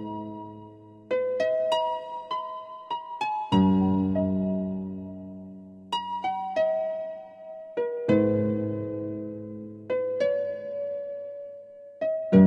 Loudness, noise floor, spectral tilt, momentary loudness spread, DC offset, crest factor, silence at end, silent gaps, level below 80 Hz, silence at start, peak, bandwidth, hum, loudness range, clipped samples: -28 LUFS; -48 dBFS; -8 dB/octave; 19 LU; under 0.1%; 20 dB; 0 s; none; -62 dBFS; 0 s; -6 dBFS; 8.2 kHz; none; 5 LU; under 0.1%